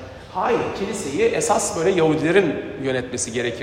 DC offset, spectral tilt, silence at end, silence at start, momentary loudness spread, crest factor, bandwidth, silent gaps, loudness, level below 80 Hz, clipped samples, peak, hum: under 0.1%; -4 dB/octave; 0 s; 0 s; 7 LU; 18 dB; 15.5 kHz; none; -21 LUFS; -50 dBFS; under 0.1%; -2 dBFS; none